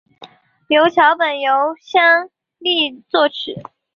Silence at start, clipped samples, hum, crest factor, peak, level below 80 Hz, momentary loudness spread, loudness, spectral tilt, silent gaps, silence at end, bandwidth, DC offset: 0.2 s; under 0.1%; none; 16 dB; -2 dBFS; -66 dBFS; 14 LU; -15 LUFS; -4.5 dB/octave; none; 0.35 s; 6.8 kHz; under 0.1%